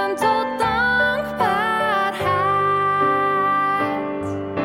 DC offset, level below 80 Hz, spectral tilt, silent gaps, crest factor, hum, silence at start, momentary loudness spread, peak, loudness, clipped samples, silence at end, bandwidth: under 0.1%; -48 dBFS; -5 dB/octave; none; 14 dB; none; 0 s; 5 LU; -6 dBFS; -19 LUFS; under 0.1%; 0 s; 16.5 kHz